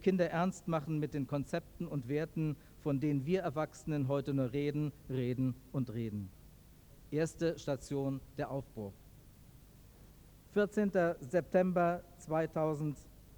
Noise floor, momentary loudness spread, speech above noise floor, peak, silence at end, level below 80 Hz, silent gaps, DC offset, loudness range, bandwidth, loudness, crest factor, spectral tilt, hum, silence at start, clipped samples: -58 dBFS; 9 LU; 23 dB; -18 dBFS; 0 s; -60 dBFS; none; under 0.1%; 6 LU; over 20 kHz; -36 LUFS; 18 dB; -7.5 dB/octave; 50 Hz at -60 dBFS; 0 s; under 0.1%